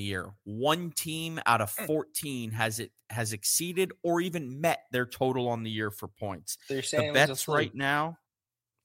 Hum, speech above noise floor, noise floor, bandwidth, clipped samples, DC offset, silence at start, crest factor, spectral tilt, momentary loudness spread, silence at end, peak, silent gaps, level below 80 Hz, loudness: none; over 60 dB; under -90 dBFS; 16.5 kHz; under 0.1%; under 0.1%; 0 s; 22 dB; -3.5 dB/octave; 10 LU; 0.7 s; -8 dBFS; none; -68 dBFS; -30 LUFS